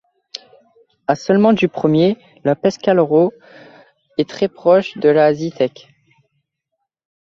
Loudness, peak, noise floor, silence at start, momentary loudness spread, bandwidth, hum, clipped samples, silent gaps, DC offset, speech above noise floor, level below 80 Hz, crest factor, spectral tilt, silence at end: -16 LUFS; -2 dBFS; -76 dBFS; 0.35 s; 14 LU; 7.4 kHz; none; under 0.1%; none; under 0.1%; 61 dB; -60 dBFS; 16 dB; -7 dB/octave; 1.55 s